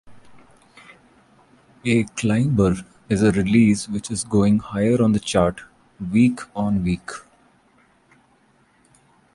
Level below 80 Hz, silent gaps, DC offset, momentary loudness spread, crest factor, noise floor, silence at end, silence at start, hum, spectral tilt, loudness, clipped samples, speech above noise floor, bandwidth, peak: -44 dBFS; none; under 0.1%; 12 LU; 18 dB; -59 dBFS; 2.15 s; 0.05 s; none; -6.5 dB/octave; -20 LUFS; under 0.1%; 40 dB; 11.5 kHz; -4 dBFS